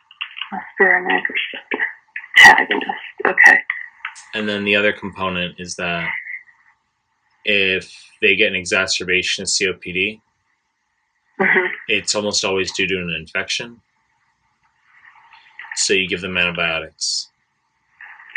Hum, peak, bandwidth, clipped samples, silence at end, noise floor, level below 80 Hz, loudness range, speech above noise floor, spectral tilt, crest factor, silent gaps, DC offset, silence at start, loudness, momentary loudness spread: none; 0 dBFS; 11 kHz; under 0.1%; 0.05 s; -69 dBFS; -60 dBFS; 10 LU; 50 dB; -2 dB/octave; 20 dB; none; under 0.1%; 0.2 s; -16 LUFS; 17 LU